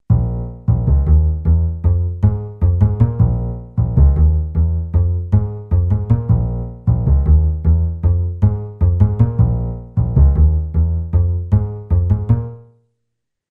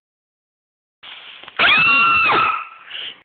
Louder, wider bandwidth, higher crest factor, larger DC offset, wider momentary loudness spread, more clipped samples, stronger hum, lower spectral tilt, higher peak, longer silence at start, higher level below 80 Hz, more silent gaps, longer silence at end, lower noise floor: second, -17 LUFS vs -13 LUFS; second, 2 kHz vs 4.7 kHz; about the same, 14 dB vs 16 dB; neither; second, 6 LU vs 21 LU; neither; neither; first, -13 dB/octave vs -6 dB/octave; about the same, -2 dBFS vs -4 dBFS; second, 0.1 s vs 1.05 s; first, -18 dBFS vs -56 dBFS; neither; first, 0.9 s vs 0.1 s; first, -76 dBFS vs -38 dBFS